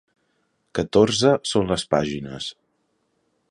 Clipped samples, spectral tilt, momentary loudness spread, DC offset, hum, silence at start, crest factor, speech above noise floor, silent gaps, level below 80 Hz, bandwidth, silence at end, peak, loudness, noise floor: under 0.1%; -5 dB/octave; 14 LU; under 0.1%; none; 0.75 s; 20 dB; 49 dB; none; -50 dBFS; 11.5 kHz; 1 s; -4 dBFS; -21 LUFS; -70 dBFS